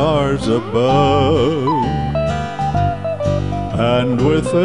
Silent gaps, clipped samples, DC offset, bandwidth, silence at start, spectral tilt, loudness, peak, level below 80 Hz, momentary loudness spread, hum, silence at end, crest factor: none; under 0.1%; 1%; 11 kHz; 0 s; -7 dB/octave; -17 LUFS; -2 dBFS; -32 dBFS; 6 LU; none; 0 s; 12 dB